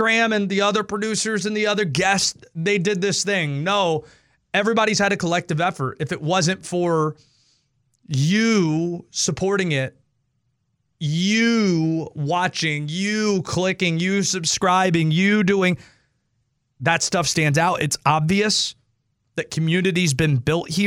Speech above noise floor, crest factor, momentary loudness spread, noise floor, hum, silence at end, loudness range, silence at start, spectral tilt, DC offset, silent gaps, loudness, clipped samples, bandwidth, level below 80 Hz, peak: 51 dB; 18 dB; 7 LU; -71 dBFS; none; 0 s; 3 LU; 0 s; -4.5 dB/octave; under 0.1%; none; -20 LUFS; under 0.1%; 15.5 kHz; -54 dBFS; -4 dBFS